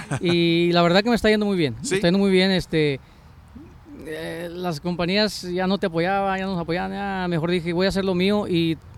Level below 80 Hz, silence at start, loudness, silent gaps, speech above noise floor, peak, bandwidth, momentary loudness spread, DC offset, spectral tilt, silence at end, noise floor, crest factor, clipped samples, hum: -46 dBFS; 0 s; -21 LUFS; none; 23 dB; -6 dBFS; 13 kHz; 11 LU; under 0.1%; -5.5 dB/octave; 0.05 s; -45 dBFS; 16 dB; under 0.1%; none